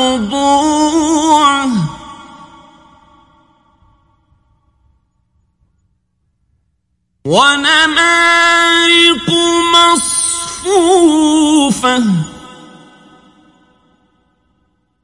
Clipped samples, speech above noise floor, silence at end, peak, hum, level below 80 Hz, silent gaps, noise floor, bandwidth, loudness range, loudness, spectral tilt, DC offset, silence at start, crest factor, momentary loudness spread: under 0.1%; 55 dB; 2.4 s; 0 dBFS; none; -48 dBFS; none; -65 dBFS; 11.5 kHz; 11 LU; -10 LUFS; -2.5 dB/octave; under 0.1%; 0 s; 14 dB; 9 LU